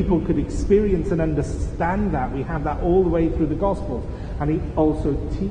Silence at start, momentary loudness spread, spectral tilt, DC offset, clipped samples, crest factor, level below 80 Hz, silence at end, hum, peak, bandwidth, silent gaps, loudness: 0 s; 8 LU; -8.5 dB/octave; under 0.1%; under 0.1%; 16 dB; -28 dBFS; 0 s; none; -6 dBFS; 10 kHz; none; -22 LUFS